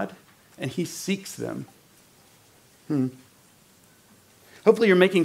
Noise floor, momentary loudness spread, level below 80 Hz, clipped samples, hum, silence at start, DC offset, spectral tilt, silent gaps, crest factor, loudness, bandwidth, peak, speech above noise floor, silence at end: -57 dBFS; 17 LU; -72 dBFS; under 0.1%; none; 0 s; under 0.1%; -5.5 dB/octave; none; 22 dB; -25 LUFS; 16 kHz; -4 dBFS; 34 dB; 0 s